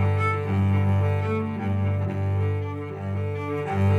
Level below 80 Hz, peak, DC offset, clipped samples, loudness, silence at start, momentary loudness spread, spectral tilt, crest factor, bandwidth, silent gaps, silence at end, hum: -62 dBFS; -12 dBFS; under 0.1%; under 0.1%; -25 LUFS; 0 s; 7 LU; -9 dB/octave; 12 dB; 4.7 kHz; none; 0 s; none